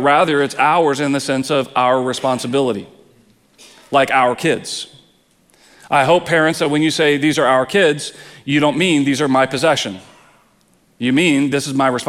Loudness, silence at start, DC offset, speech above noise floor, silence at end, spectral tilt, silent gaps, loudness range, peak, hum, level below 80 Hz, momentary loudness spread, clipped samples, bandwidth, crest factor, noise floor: -16 LUFS; 0 s; under 0.1%; 40 dB; 0 s; -4.5 dB/octave; none; 4 LU; 0 dBFS; none; -60 dBFS; 9 LU; under 0.1%; 15 kHz; 16 dB; -56 dBFS